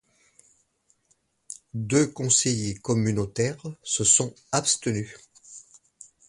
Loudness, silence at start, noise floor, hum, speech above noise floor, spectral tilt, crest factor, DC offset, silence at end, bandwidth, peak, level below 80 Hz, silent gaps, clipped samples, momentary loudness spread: -24 LUFS; 1.5 s; -69 dBFS; none; 44 dB; -3.5 dB/octave; 22 dB; under 0.1%; 0.7 s; 11.5 kHz; -4 dBFS; -58 dBFS; none; under 0.1%; 23 LU